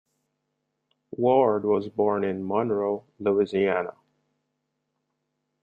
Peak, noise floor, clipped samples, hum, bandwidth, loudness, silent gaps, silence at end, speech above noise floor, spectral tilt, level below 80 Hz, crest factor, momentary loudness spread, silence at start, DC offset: -8 dBFS; -79 dBFS; under 0.1%; none; 4.8 kHz; -25 LUFS; none; 1.7 s; 55 dB; -8.5 dB/octave; -70 dBFS; 18 dB; 8 LU; 1.1 s; under 0.1%